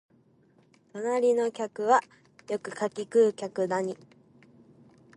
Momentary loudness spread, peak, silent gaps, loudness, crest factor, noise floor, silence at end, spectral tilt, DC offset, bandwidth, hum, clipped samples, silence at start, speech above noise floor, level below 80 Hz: 12 LU; -10 dBFS; none; -28 LUFS; 18 dB; -63 dBFS; 1.2 s; -5 dB/octave; under 0.1%; 11 kHz; none; under 0.1%; 0.95 s; 36 dB; -80 dBFS